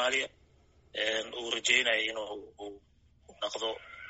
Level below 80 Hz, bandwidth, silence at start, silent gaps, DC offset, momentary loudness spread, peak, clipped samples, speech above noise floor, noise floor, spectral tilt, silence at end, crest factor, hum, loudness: -66 dBFS; 8 kHz; 0 s; none; under 0.1%; 18 LU; -10 dBFS; under 0.1%; 31 dB; -64 dBFS; 2 dB/octave; 0 s; 24 dB; none; -31 LUFS